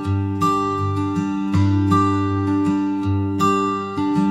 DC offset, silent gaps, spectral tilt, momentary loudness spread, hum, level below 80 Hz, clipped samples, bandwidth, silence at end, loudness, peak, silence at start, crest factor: 0.1%; none; -7.5 dB/octave; 5 LU; none; -54 dBFS; under 0.1%; 12.5 kHz; 0 s; -20 LUFS; -6 dBFS; 0 s; 14 dB